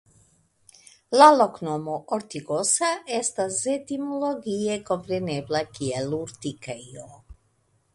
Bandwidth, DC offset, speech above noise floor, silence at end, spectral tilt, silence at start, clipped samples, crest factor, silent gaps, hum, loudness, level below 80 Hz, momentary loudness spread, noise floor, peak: 11.5 kHz; under 0.1%; 43 dB; 0.6 s; -3.5 dB/octave; 1.1 s; under 0.1%; 24 dB; none; none; -24 LUFS; -60 dBFS; 18 LU; -67 dBFS; -2 dBFS